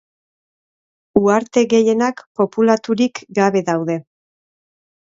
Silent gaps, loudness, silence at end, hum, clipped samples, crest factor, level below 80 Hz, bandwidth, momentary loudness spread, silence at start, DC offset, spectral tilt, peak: 2.26-2.35 s; -17 LUFS; 1.05 s; none; under 0.1%; 18 dB; -60 dBFS; 7.8 kHz; 7 LU; 1.15 s; under 0.1%; -5.5 dB/octave; 0 dBFS